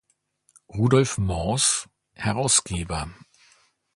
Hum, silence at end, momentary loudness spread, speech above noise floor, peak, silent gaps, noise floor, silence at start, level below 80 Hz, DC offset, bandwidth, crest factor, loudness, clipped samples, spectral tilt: none; 0.8 s; 11 LU; 44 dB; -6 dBFS; none; -67 dBFS; 0.75 s; -42 dBFS; under 0.1%; 11.5 kHz; 20 dB; -23 LUFS; under 0.1%; -4 dB/octave